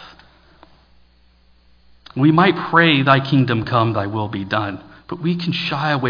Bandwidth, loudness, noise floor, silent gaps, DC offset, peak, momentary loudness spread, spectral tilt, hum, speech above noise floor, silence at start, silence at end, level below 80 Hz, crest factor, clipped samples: 5.2 kHz; -17 LUFS; -54 dBFS; none; under 0.1%; 0 dBFS; 13 LU; -8 dB/octave; 60 Hz at -45 dBFS; 37 dB; 0 s; 0 s; -54 dBFS; 18 dB; under 0.1%